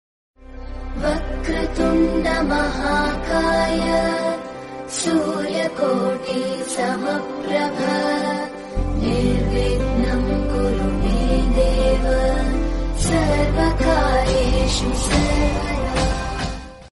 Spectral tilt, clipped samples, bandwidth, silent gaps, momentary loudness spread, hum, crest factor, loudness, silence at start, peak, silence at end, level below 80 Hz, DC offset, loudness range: -5.5 dB/octave; under 0.1%; 11.5 kHz; none; 7 LU; none; 16 dB; -20 LUFS; 0.4 s; -4 dBFS; 0.05 s; -24 dBFS; under 0.1%; 3 LU